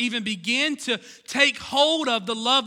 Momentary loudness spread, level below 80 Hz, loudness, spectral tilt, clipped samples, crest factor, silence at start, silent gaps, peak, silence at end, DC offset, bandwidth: 8 LU; -66 dBFS; -22 LUFS; -2 dB/octave; under 0.1%; 18 dB; 0 s; none; -4 dBFS; 0 s; under 0.1%; 16.5 kHz